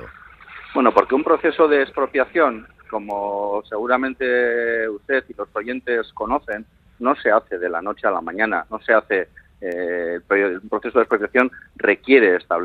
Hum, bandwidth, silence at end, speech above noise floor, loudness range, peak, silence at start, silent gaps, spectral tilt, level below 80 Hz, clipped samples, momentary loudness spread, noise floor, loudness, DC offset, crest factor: none; 5.6 kHz; 0 s; 23 dB; 3 LU; 0 dBFS; 0 s; none; -6.5 dB/octave; -54 dBFS; under 0.1%; 11 LU; -42 dBFS; -20 LUFS; under 0.1%; 20 dB